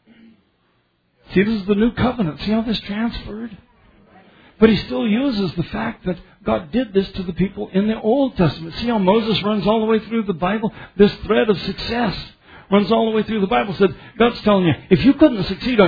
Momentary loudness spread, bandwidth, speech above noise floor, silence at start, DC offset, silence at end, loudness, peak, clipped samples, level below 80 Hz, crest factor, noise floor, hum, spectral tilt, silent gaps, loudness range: 9 LU; 5 kHz; 46 dB; 1.3 s; under 0.1%; 0 s; -19 LUFS; 0 dBFS; under 0.1%; -40 dBFS; 18 dB; -63 dBFS; none; -8.5 dB/octave; none; 4 LU